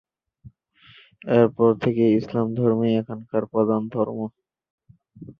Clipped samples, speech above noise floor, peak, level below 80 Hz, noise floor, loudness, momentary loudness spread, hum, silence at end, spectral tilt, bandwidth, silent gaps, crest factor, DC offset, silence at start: under 0.1%; 32 dB; -4 dBFS; -62 dBFS; -53 dBFS; -22 LUFS; 8 LU; none; 0.05 s; -10 dB/octave; 5.6 kHz; 4.70-4.78 s; 20 dB; under 0.1%; 0.45 s